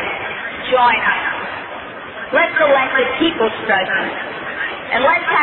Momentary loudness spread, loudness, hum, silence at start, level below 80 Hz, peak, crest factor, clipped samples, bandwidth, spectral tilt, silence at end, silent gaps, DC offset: 13 LU; -16 LUFS; none; 0 s; -52 dBFS; -2 dBFS; 16 dB; under 0.1%; 4.2 kHz; -7 dB/octave; 0 s; none; under 0.1%